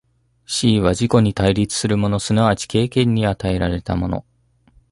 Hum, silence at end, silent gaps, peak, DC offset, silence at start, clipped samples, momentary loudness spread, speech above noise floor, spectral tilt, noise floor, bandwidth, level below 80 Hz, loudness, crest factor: none; 0.7 s; none; -2 dBFS; under 0.1%; 0.5 s; under 0.1%; 6 LU; 38 dB; -5.5 dB/octave; -55 dBFS; 11.5 kHz; -36 dBFS; -18 LUFS; 16 dB